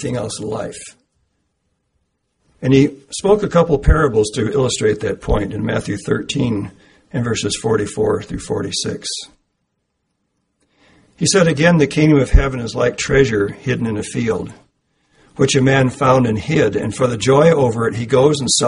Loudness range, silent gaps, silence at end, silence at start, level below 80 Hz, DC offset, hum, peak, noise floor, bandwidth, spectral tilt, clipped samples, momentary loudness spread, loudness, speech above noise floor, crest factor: 6 LU; none; 0 s; 0 s; -28 dBFS; under 0.1%; none; 0 dBFS; -71 dBFS; 11 kHz; -5 dB/octave; under 0.1%; 11 LU; -16 LUFS; 55 dB; 16 dB